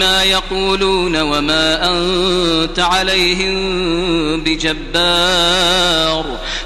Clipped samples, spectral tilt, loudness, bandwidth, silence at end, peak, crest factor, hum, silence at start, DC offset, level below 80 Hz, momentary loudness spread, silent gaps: under 0.1%; -3 dB/octave; -13 LUFS; 14 kHz; 0 s; 0 dBFS; 14 dB; none; 0 s; under 0.1%; -28 dBFS; 5 LU; none